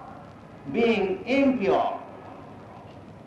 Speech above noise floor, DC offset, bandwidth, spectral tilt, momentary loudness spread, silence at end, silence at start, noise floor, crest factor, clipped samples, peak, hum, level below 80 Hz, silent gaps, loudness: 22 dB; under 0.1%; 8 kHz; -6.5 dB/octave; 22 LU; 0.05 s; 0 s; -45 dBFS; 14 dB; under 0.1%; -14 dBFS; none; -58 dBFS; none; -24 LUFS